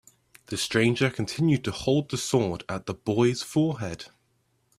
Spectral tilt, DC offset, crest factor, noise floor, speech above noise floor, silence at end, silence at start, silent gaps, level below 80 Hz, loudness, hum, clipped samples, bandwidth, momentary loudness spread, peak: -5.5 dB/octave; under 0.1%; 20 dB; -70 dBFS; 44 dB; 0.75 s; 0.5 s; none; -58 dBFS; -26 LUFS; none; under 0.1%; 14.5 kHz; 11 LU; -8 dBFS